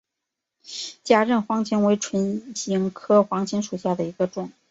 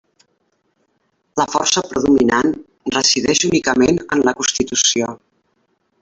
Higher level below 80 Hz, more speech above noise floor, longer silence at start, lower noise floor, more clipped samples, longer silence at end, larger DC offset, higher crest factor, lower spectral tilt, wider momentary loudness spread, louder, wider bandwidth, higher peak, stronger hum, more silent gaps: second, -66 dBFS vs -48 dBFS; first, 61 dB vs 50 dB; second, 0.65 s vs 1.35 s; first, -84 dBFS vs -66 dBFS; neither; second, 0.2 s vs 0.85 s; neither; about the same, 20 dB vs 16 dB; first, -5 dB/octave vs -2.5 dB/octave; first, 13 LU vs 8 LU; second, -23 LUFS vs -16 LUFS; about the same, 8 kHz vs 8.4 kHz; about the same, -2 dBFS vs -2 dBFS; neither; neither